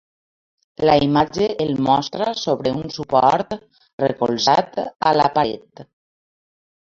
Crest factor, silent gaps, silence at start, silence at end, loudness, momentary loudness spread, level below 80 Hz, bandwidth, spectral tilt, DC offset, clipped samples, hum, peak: 18 dB; 3.93-3.98 s; 0.8 s; 1.1 s; -19 LUFS; 8 LU; -52 dBFS; 7.6 kHz; -5.5 dB/octave; under 0.1%; under 0.1%; none; -2 dBFS